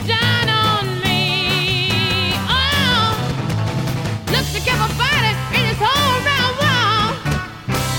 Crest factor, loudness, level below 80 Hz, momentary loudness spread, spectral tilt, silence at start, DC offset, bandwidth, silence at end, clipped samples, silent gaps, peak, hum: 14 dB; -17 LUFS; -34 dBFS; 7 LU; -4 dB/octave; 0 s; under 0.1%; 17.5 kHz; 0 s; under 0.1%; none; -2 dBFS; none